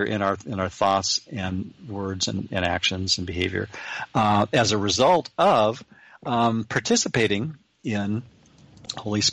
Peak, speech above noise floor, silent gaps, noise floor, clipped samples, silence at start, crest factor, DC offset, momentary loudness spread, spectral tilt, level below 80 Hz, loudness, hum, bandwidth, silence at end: -8 dBFS; 28 dB; none; -52 dBFS; under 0.1%; 0 s; 16 dB; under 0.1%; 13 LU; -4 dB/octave; -54 dBFS; -23 LUFS; none; 11 kHz; 0 s